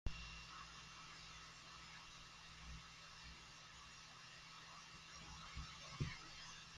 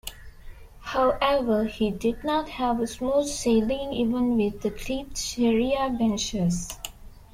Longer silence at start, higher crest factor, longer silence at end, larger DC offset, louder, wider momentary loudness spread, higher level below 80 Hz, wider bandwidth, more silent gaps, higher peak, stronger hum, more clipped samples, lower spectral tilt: about the same, 0.05 s vs 0.05 s; first, 26 dB vs 16 dB; about the same, 0 s vs 0.1 s; neither; second, -55 LUFS vs -25 LUFS; about the same, 8 LU vs 9 LU; second, -62 dBFS vs -44 dBFS; second, 13.5 kHz vs 16 kHz; neither; second, -28 dBFS vs -8 dBFS; neither; neither; second, -3 dB/octave vs -5 dB/octave